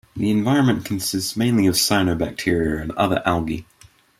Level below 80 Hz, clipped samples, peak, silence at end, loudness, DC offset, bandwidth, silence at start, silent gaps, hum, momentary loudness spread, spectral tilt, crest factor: -44 dBFS; under 0.1%; -4 dBFS; 0.6 s; -20 LUFS; under 0.1%; 16 kHz; 0.15 s; none; none; 7 LU; -4.5 dB/octave; 18 dB